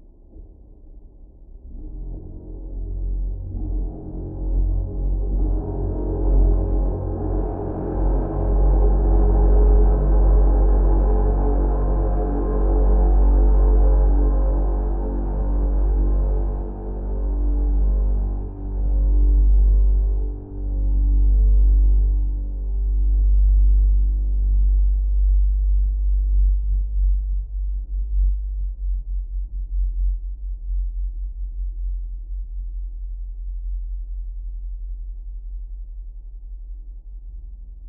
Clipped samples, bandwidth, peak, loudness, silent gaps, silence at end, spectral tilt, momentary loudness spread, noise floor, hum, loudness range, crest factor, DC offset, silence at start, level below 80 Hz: under 0.1%; 1.7 kHz; -6 dBFS; -23 LUFS; none; 0 s; -13.5 dB/octave; 17 LU; -43 dBFS; none; 14 LU; 12 dB; under 0.1%; 0.35 s; -20 dBFS